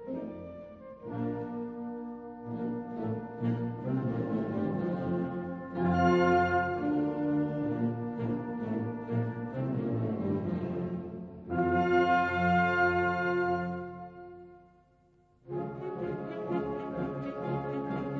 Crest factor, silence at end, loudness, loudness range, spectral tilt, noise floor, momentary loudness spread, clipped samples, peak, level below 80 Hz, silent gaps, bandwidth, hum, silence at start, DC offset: 18 dB; 0 s; -32 LUFS; 9 LU; -8.5 dB/octave; -65 dBFS; 15 LU; under 0.1%; -14 dBFS; -60 dBFS; none; 7 kHz; none; 0 s; under 0.1%